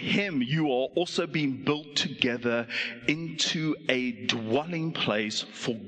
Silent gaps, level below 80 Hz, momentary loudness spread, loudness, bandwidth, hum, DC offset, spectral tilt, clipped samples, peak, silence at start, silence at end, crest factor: none; -68 dBFS; 3 LU; -28 LUFS; 9.4 kHz; none; under 0.1%; -4.5 dB/octave; under 0.1%; -6 dBFS; 0 s; 0 s; 24 dB